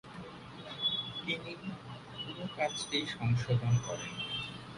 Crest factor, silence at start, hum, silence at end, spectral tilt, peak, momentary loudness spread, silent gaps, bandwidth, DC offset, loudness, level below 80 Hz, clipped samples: 18 dB; 0.05 s; none; 0 s; -4.5 dB/octave; -18 dBFS; 15 LU; none; 11 kHz; under 0.1%; -35 LUFS; -60 dBFS; under 0.1%